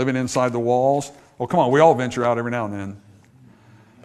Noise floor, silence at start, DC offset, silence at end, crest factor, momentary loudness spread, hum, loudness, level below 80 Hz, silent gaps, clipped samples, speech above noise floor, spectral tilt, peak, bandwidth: -50 dBFS; 0 s; under 0.1%; 1.05 s; 20 dB; 17 LU; none; -20 LUFS; -56 dBFS; none; under 0.1%; 31 dB; -6 dB/octave; -2 dBFS; 13 kHz